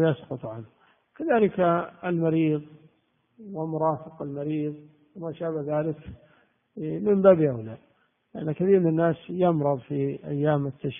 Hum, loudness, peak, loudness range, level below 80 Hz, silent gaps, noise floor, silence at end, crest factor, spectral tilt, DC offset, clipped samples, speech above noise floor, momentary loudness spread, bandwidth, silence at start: none; -25 LUFS; -4 dBFS; 7 LU; -64 dBFS; none; -69 dBFS; 0 s; 22 dB; -8 dB/octave; under 0.1%; under 0.1%; 44 dB; 18 LU; 3.7 kHz; 0 s